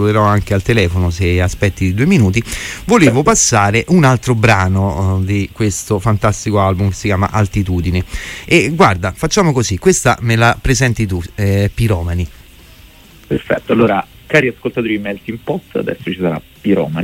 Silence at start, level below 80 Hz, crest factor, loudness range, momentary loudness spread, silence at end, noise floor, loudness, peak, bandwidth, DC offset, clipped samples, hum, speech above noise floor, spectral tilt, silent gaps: 0 s; -32 dBFS; 14 dB; 5 LU; 10 LU; 0 s; -40 dBFS; -14 LUFS; 0 dBFS; 16 kHz; under 0.1%; under 0.1%; none; 27 dB; -5.5 dB/octave; none